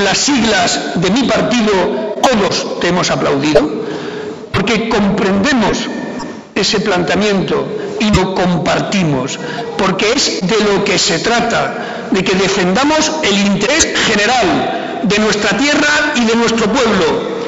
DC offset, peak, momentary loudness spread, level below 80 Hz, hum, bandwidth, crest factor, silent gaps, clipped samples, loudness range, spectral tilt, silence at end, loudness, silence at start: under 0.1%; 0 dBFS; 7 LU; -38 dBFS; none; 12 kHz; 14 dB; none; under 0.1%; 3 LU; -4 dB/octave; 0 s; -13 LUFS; 0 s